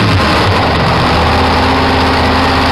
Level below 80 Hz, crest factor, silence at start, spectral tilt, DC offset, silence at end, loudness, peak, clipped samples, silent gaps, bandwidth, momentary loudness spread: -22 dBFS; 6 dB; 0 s; -5.5 dB/octave; under 0.1%; 0 s; -10 LUFS; -4 dBFS; under 0.1%; none; 13.5 kHz; 1 LU